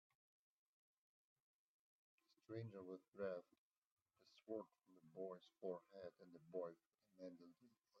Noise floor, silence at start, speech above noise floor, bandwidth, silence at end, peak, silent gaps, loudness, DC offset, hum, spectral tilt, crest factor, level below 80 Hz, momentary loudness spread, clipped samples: -78 dBFS; 2.5 s; 23 dB; 6.4 kHz; 0 s; -38 dBFS; 3.08-3.12 s, 3.58-3.71 s, 3.78-3.82 s, 3.92-4.06 s; -55 LUFS; under 0.1%; none; -6.5 dB/octave; 20 dB; under -90 dBFS; 13 LU; under 0.1%